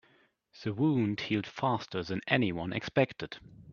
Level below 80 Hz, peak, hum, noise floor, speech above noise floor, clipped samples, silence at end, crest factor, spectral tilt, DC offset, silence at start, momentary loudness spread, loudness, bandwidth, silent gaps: -64 dBFS; -10 dBFS; none; -67 dBFS; 36 dB; under 0.1%; 0 s; 24 dB; -7 dB/octave; under 0.1%; 0.55 s; 12 LU; -31 LUFS; 7 kHz; none